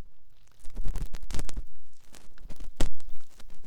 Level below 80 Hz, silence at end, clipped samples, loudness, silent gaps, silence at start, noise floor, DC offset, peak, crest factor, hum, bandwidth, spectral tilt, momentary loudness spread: -36 dBFS; 0 s; under 0.1%; -41 LUFS; none; 0 s; -44 dBFS; under 0.1%; -8 dBFS; 14 dB; none; 10.5 kHz; -4.5 dB/octave; 18 LU